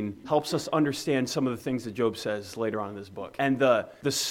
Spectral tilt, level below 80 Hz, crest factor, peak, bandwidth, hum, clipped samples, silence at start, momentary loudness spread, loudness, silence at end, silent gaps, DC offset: -4.5 dB/octave; -66 dBFS; 18 dB; -10 dBFS; 17 kHz; none; under 0.1%; 0 s; 9 LU; -28 LUFS; 0 s; none; under 0.1%